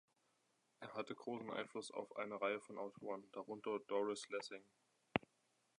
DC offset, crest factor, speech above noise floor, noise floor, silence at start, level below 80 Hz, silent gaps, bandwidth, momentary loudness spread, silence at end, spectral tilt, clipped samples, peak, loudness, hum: under 0.1%; 32 dB; 36 dB; -82 dBFS; 0.8 s; -84 dBFS; none; 11 kHz; 9 LU; 0.6 s; -4.5 dB/octave; under 0.1%; -16 dBFS; -46 LUFS; none